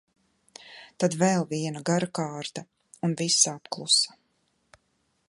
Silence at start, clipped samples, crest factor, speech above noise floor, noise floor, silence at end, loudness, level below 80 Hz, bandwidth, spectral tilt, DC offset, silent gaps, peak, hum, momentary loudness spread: 0.65 s; under 0.1%; 22 dB; 46 dB; -73 dBFS; 1.2 s; -25 LUFS; -74 dBFS; 11.5 kHz; -3 dB/octave; under 0.1%; none; -6 dBFS; none; 18 LU